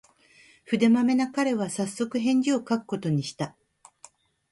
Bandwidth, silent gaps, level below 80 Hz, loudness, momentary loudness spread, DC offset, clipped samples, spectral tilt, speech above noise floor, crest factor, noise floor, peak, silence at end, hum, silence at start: 11.5 kHz; none; -70 dBFS; -26 LUFS; 9 LU; under 0.1%; under 0.1%; -5.5 dB/octave; 33 dB; 16 dB; -57 dBFS; -10 dBFS; 1 s; none; 0.7 s